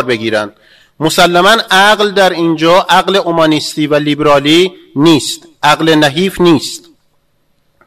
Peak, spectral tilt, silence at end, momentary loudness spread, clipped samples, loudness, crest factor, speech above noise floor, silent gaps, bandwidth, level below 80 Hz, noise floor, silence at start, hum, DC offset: 0 dBFS; -4 dB/octave; 1.1 s; 8 LU; 0.2%; -9 LUFS; 10 dB; 49 dB; none; 16 kHz; -44 dBFS; -59 dBFS; 0 s; none; 0.6%